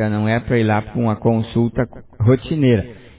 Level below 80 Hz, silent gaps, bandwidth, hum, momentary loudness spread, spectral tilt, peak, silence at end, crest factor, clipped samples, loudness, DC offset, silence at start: -40 dBFS; none; 4 kHz; none; 4 LU; -12 dB/octave; -2 dBFS; 0.2 s; 16 dB; under 0.1%; -18 LUFS; under 0.1%; 0 s